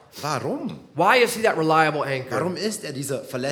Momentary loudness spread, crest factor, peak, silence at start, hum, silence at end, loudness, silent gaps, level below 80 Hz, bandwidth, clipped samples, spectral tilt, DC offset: 12 LU; 20 dB; -4 dBFS; 0.15 s; none; 0 s; -22 LUFS; none; -70 dBFS; 19.5 kHz; under 0.1%; -4 dB/octave; under 0.1%